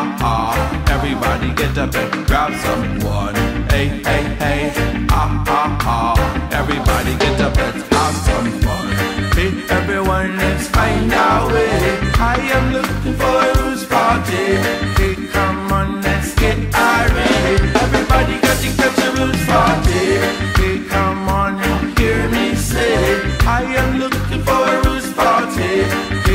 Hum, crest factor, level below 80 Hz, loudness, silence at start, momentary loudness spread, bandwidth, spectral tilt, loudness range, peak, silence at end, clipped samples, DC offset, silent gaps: none; 14 dB; -22 dBFS; -16 LUFS; 0 s; 4 LU; 16.5 kHz; -5 dB/octave; 3 LU; -2 dBFS; 0 s; under 0.1%; under 0.1%; none